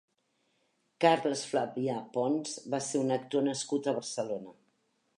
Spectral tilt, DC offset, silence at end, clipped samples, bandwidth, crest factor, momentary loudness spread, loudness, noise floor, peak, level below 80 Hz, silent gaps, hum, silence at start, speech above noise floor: -4.5 dB/octave; under 0.1%; 0.65 s; under 0.1%; 11.5 kHz; 22 dB; 9 LU; -32 LUFS; -76 dBFS; -10 dBFS; -84 dBFS; none; none; 1 s; 45 dB